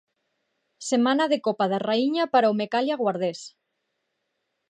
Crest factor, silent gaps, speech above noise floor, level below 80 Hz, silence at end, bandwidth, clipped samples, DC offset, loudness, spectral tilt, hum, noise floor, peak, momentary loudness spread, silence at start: 18 dB; none; 55 dB; -80 dBFS; 1.2 s; 10 kHz; under 0.1%; under 0.1%; -24 LUFS; -4.5 dB/octave; none; -78 dBFS; -8 dBFS; 10 LU; 0.8 s